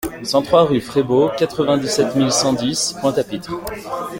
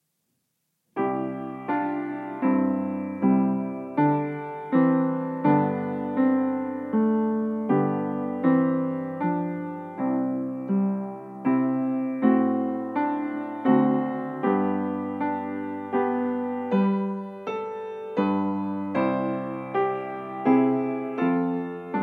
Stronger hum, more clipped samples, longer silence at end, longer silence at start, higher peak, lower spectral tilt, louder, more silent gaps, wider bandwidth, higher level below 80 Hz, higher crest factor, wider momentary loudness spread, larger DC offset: neither; neither; about the same, 0 s vs 0 s; second, 0 s vs 0.95 s; first, -2 dBFS vs -8 dBFS; second, -4.5 dB/octave vs -10.5 dB/octave; first, -18 LUFS vs -26 LUFS; neither; first, 17 kHz vs 4.3 kHz; first, -48 dBFS vs -78 dBFS; about the same, 16 dB vs 18 dB; first, 12 LU vs 9 LU; neither